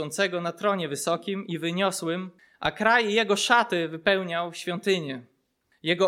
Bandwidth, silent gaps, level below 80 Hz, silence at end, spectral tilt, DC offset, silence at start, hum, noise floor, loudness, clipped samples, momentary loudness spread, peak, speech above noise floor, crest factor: 16.5 kHz; none; -64 dBFS; 0 s; -3.5 dB/octave; under 0.1%; 0 s; none; -70 dBFS; -25 LUFS; under 0.1%; 10 LU; -6 dBFS; 44 dB; 20 dB